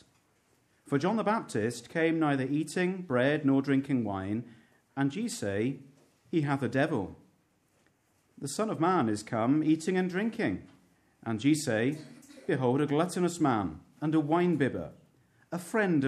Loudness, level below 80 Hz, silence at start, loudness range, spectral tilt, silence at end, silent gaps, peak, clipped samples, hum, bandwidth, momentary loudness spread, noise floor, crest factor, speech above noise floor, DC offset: -30 LUFS; -68 dBFS; 0.85 s; 4 LU; -6 dB/octave; 0 s; none; -14 dBFS; under 0.1%; none; 14 kHz; 13 LU; -70 dBFS; 16 dB; 41 dB; under 0.1%